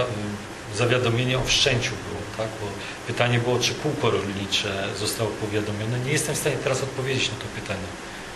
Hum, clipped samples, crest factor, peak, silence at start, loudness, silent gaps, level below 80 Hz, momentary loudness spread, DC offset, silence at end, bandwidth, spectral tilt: none; under 0.1%; 22 dB; -2 dBFS; 0 s; -25 LUFS; none; -46 dBFS; 11 LU; under 0.1%; 0 s; 12.5 kHz; -4 dB/octave